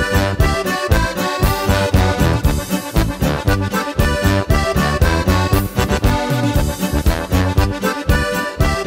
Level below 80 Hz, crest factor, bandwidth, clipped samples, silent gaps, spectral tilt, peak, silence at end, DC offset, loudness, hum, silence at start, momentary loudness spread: -22 dBFS; 16 dB; 16.5 kHz; under 0.1%; none; -5.5 dB/octave; 0 dBFS; 0 s; under 0.1%; -17 LUFS; none; 0 s; 3 LU